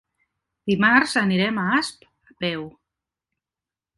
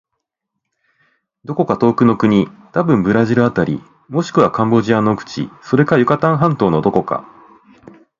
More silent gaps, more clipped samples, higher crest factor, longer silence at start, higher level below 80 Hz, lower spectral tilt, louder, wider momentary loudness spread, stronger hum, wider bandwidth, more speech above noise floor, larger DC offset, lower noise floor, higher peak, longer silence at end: neither; neither; first, 22 dB vs 16 dB; second, 0.65 s vs 1.5 s; second, -60 dBFS vs -50 dBFS; second, -5 dB/octave vs -8 dB/octave; second, -21 LUFS vs -15 LUFS; first, 16 LU vs 11 LU; neither; first, 11.5 kHz vs 7.4 kHz; first, 69 dB vs 63 dB; neither; first, -90 dBFS vs -77 dBFS; second, -4 dBFS vs 0 dBFS; first, 1.25 s vs 1 s